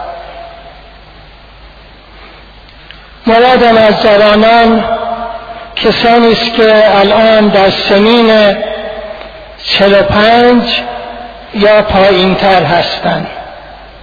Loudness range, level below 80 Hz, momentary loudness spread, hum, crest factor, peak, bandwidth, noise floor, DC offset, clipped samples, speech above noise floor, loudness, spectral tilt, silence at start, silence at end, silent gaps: 4 LU; -34 dBFS; 19 LU; none; 8 dB; 0 dBFS; 5.4 kHz; -35 dBFS; under 0.1%; 0.3%; 28 dB; -7 LUFS; -6.5 dB/octave; 0 s; 0.15 s; none